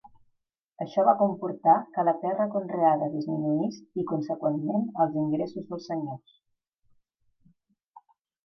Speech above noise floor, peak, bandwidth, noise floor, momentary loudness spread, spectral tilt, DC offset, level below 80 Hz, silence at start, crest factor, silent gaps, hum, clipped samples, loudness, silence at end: 48 dB; -8 dBFS; 6.4 kHz; -75 dBFS; 11 LU; -9 dB/octave; under 0.1%; -78 dBFS; 0.05 s; 20 dB; 0.63-0.72 s; none; under 0.1%; -27 LUFS; 2.3 s